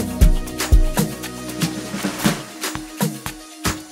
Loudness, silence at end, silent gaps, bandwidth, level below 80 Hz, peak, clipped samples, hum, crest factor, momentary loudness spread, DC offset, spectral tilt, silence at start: -23 LUFS; 0 s; none; 16 kHz; -22 dBFS; -2 dBFS; under 0.1%; none; 18 dB; 9 LU; under 0.1%; -4.5 dB/octave; 0 s